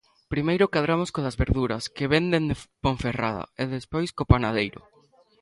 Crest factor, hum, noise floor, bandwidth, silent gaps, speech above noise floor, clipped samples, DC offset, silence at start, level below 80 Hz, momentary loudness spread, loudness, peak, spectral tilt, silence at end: 24 dB; none; -60 dBFS; 11.5 kHz; none; 35 dB; under 0.1%; under 0.1%; 0.3 s; -38 dBFS; 8 LU; -25 LUFS; 0 dBFS; -6.5 dB/octave; 0.65 s